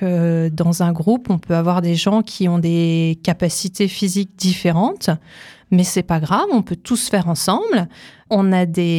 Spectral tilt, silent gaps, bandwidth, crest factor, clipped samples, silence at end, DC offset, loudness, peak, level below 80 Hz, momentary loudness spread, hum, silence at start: -5.5 dB/octave; none; 15.5 kHz; 16 dB; under 0.1%; 0 s; under 0.1%; -18 LUFS; -2 dBFS; -50 dBFS; 4 LU; none; 0 s